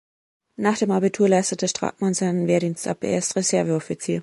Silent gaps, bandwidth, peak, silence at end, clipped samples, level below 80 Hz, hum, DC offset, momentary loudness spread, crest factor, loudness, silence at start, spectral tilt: none; 11.5 kHz; -6 dBFS; 0 s; under 0.1%; -64 dBFS; none; under 0.1%; 6 LU; 16 dB; -22 LUFS; 0.6 s; -5 dB/octave